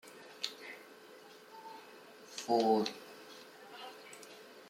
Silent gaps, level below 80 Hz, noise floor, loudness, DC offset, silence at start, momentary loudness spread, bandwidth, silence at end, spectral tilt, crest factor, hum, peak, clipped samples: none; -90 dBFS; -56 dBFS; -36 LUFS; under 0.1%; 0.05 s; 23 LU; 16.5 kHz; 0.1 s; -4 dB/octave; 22 dB; none; -18 dBFS; under 0.1%